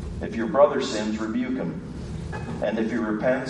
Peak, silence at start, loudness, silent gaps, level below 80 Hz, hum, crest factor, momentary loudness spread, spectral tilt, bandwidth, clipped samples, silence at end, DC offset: -6 dBFS; 0 s; -26 LUFS; none; -44 dBFS; none; 20 dB; 13 LU; -6 dB/octave; 10.5 kHz; under 0.1%; 0 s; under 0.1%